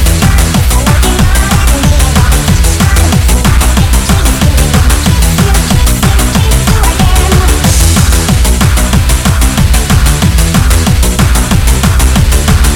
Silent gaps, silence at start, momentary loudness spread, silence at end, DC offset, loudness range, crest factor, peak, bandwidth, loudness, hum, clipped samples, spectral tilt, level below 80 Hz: none; 0 s; 1 LU; 0 s; under 0.1%; 0 LU; 6 dB; 0 dBFS; 18.5 kHz; -8 LUFS; none; 0.7%; -4.5 dB/octave; -8 dBFS